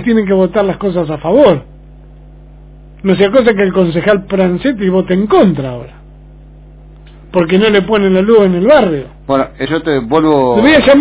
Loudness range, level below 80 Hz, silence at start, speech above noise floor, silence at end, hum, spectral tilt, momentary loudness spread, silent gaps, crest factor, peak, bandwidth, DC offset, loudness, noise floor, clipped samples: 3 LU; -36 dBFS; 0 s; 25 dB; 0 s; 50 Hz at -35 dBFS; -10.5 dB/octave; 8 LU; none; 12 dB; 0 dBFS; 4 kHz; under 0.1%; -11 LUFS; -35 dBFS; 0.8%